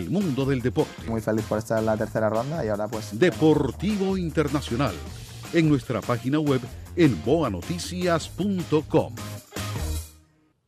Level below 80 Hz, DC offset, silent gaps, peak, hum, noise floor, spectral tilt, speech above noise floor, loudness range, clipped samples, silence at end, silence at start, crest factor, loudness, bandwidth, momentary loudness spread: -44 dBFS; under 0.1%; none; -8 dBFS; none; -60 dBFS; -6.5 dB/octave; 36 dB; 2 LU; under 0.1%; 0.55 s; 0 s; 16 dB; -25 LUFS; 15.5 kHz; 11 LU